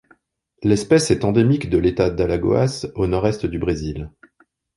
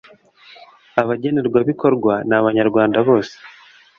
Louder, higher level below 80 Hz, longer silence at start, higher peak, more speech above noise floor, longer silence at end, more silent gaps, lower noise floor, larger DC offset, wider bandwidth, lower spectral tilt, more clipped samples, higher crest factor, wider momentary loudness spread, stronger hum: about the same, -19 LUFS vs -17 LUFS; first, -38 dBFS vs -56 dBFS; second, 0.6 s vs 0.95 s; about the same, -2 dBFS vs 0 dBFS; first, 46 dB vs 31 dB; first, 0.7 s vs 0.5 s; neither; first, -64 dBFS vs -47 dBFS; neither; first, 11.5 kHz vs 7 kHz; second, -6.5 dB/octave vs -8 dB/octave; neither; about the same, 16 dB vs 18 dB; first, 9 LU vs 5 LU; neither